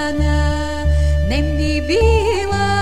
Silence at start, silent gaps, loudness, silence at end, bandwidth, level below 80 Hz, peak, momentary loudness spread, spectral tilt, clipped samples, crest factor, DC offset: 0 s; none; -17 LUFS; 0 s; 11 kHz; -20 dBFS; -2 dBFS; 4 LU; -6 dB/octave; under 0.1%; 12 dB; 3%